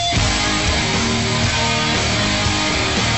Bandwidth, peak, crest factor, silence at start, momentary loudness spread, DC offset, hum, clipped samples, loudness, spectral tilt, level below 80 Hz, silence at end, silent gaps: 8.4 kHz; -4 dBFS; 14 dB; 0 s; 1 LU; 0.6%; none; under 0.1%; -17 LUFS; -3 dB/octave; -28 dBFS; 0 s; none